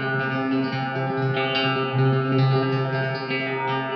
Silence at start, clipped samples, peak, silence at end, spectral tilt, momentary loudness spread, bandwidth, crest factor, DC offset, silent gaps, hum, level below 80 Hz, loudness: 0 s; under 0.1%; -10 dBFS; 0 s; -8.5 dB/octave; 5 LU; 6 kHz; 12 dB; under 0.1%; none; none; -70 dBFS; -23 LUFS